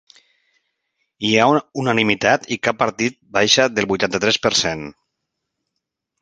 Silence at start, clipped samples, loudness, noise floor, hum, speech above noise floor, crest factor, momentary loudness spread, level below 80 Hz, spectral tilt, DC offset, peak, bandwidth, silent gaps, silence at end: 1.2 s; under 0.1%; -17 LUFS; -79 dBFS; none; 61 dB; 20 dB; 9 LU; -54 dBFS; -3 dB/octave; under 0.1%; 0 dBFS; 10.5 kHz; none; 1.3 s